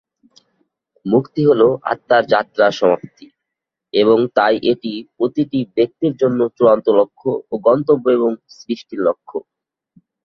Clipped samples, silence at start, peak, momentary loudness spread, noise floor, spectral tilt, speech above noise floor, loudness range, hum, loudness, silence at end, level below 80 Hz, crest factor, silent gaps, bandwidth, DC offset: under 0.1%; 1.05 s; -2 dBFS; 12 LU; -82 dBFS; -7 dB/octave; 67 dB; 2 LU; none; -16 LUFS; 0.85 s; -60 dBFS; 16 dB; none; 6.6 kHz; under 0.1%